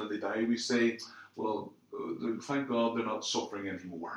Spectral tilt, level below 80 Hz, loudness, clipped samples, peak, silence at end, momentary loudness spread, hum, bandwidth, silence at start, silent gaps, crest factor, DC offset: -4 dB/octave; -82 dBFS; -34 LUFS; under 0.1%; -18 dBFS; 0 s; 12 LU; none; 11 kHz; 0 s; none; 16 dB; under 0.1%